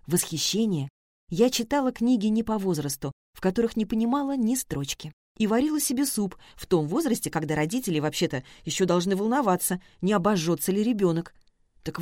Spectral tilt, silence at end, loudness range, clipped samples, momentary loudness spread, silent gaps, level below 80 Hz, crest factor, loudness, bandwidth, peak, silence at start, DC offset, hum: -5 dB/octave; 0 s; 2 LU; under 0.1%; 9 LU; 0.90-1.27 s, 3.13-3.33 s, 5.13-5.35 s; -54 dBFS; 18 dB; -26 LUFS; 16.5 kHz; -8 dBFS; 0.1 s; under 0.1%; none